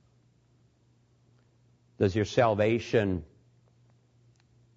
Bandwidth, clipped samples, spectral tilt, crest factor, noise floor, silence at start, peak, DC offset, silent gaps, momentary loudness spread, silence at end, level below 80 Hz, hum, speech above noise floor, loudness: 7.8 kHz; under 0.1%; -6.5 dB/octave; 22 dB; -66 dBFS; 2 s; -10 dBFS; under 0.1%; none; 7 LU; 1.5 s; -60 dBFS; none; 40 dB; -27 LUFS